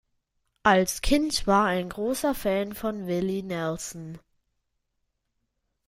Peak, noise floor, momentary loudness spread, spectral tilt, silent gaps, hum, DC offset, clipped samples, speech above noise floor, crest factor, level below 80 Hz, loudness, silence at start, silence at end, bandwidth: -6 dBFS; -78 dBFS; 11 LU; -4.5 dB/octave; none; none; under 0.1%; under 0.1%; 52 dB; 22 dB; -44 dBFS; -26 LUFS; 0.65 s; 1.7 s; 16 kHz